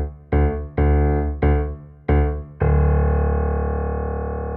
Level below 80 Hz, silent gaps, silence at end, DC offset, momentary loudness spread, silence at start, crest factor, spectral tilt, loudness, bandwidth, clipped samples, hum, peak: -22 dBFS; none; 0 s; under 0.1%; 7 LU; 0 s; 12 dB; -13 dB/octave; -21 LUFS; 3.1 kHz; under 0.1%; none; -6 dBFS